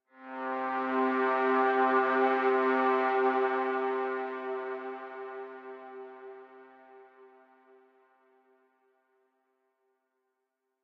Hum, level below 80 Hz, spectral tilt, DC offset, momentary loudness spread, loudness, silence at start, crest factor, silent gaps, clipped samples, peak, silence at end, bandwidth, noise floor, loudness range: none; under -90 dBFS; -5.5 dB/octave; under 0.1%; 20 LU; -29 LUFS; 0.2 s; 18 dB; none; under 0.1%; -14 dBFS; 3.55 s; 5.6 kHz; -83 dBFS; 21 LU